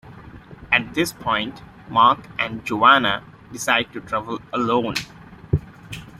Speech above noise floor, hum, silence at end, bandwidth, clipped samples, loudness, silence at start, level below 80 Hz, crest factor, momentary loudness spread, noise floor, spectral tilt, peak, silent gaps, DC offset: 21 dB; none; 0.1 s; 16 kHz; under 0.1%; -20 LUFS; 0.05 s; -46 dBFS; 20 dB; 13 LU; -41 dBFS; -4 dB/octave; -2 dBFS; none; under 0.1%